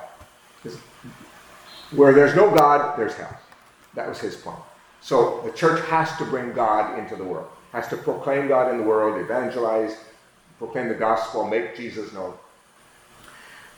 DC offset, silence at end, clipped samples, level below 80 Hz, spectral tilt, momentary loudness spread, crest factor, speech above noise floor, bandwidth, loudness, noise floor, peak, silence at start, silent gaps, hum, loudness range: under 0.1%; 0.15 s; under 0.1%; -62 dBFS; -6 dB/octave; 24 LU; 22 dB; 33 dB; over 20 kHz; -21 LUFS; -54 dBFS; -2 dBFS; 0 s; none; none; 8 LU